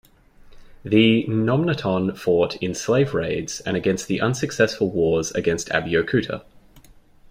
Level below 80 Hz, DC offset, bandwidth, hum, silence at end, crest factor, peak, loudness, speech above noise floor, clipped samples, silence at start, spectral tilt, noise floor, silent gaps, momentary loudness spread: -50 dBFS; under 0.1%; 16 kHz; none; 0.4 s; 18 dB; -2 dBFS; -21 LUFS; 29 dB; under 0.1%; 0.45 s; -5.5 dB/octave; -49 dBFS; none; 8 LU